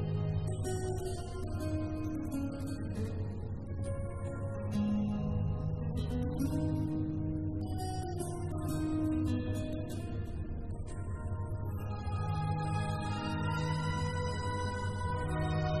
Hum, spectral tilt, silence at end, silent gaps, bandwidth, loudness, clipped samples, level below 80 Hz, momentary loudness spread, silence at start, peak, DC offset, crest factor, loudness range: none; -7 dB/octave; 0 s; none; 13 kHz; -36 LUFS; under 0.1%; -46 dBFS; 6 LU; 0 s; -22 dBFS; 0.3%; 12 dB; 3 LU